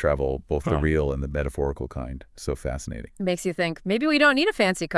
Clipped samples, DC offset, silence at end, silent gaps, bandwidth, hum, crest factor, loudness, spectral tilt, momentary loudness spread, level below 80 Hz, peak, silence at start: under 0.1%; under 0.1%; 0 s; none; 12 kHz; none; 18 dB; -24 LUFS; -5.5 dB/octave; 15 LU; -36 dBFS; -6 dBFS; 0 s